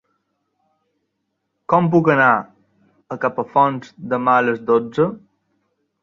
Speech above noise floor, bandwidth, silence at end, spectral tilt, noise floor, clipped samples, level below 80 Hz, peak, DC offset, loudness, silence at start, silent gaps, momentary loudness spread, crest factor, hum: 57 dB; 7.2 kHz; 0.85 s; -8.5 dB/octave; -74 dBFS; under 0.1%; -62 dBFS; -2 dBFS; under 0.1%; -17 LUFS; 1.7 s; none; 10 LU; 18 dB; none